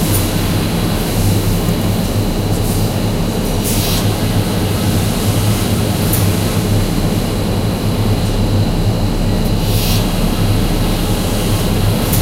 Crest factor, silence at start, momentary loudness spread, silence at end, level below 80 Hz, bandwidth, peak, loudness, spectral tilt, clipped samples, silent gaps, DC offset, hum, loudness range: 12 dB; 0 s; 2 LU; 0 s; -22 dBFS; 16 kHz; -2 dBFS; -15 LUFS; -5.5 dB/octave; under 0.1%; none; under 0.1%; none; 1 LU